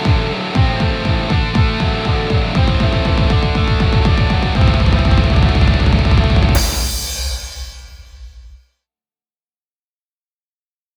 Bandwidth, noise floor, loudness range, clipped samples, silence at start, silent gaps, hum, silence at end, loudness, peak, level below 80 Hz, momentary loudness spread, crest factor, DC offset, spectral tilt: over 20 kHz; under -90 dBFS; 10 LU; under 0.1%; 0 s; none; none; 2.4 s; -15 LUFS; 0 dBFS; -20 dBFS; 7 LU; 14 dB; under 0.1%; -5.5 dB/octave